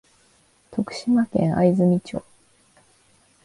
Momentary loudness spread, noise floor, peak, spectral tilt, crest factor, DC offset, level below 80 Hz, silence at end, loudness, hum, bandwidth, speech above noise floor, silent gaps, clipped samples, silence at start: 15 LU; -60 dBFS; -6 dBFS; -8 dB/octave; 18 dB; under 0.1%; -56 dBFS; 1.25 s; -21 LUFS; none; 11.5 kHz; 40 dB; none; under 0.1%; 0.7 s